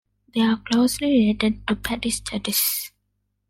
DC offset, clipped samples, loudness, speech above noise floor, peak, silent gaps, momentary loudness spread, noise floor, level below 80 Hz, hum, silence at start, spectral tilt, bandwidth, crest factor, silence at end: under 0.1%; under 0.1%; -22 LUFS; 52 dB; -4 dBFS; none; 7 LU; -73 dBFS; -46 dBFS; 50 Hz at -40 dBFS; 0.35 s; -3.5 dB/octave; 16.5 kHz; 18 dB; 0.6 s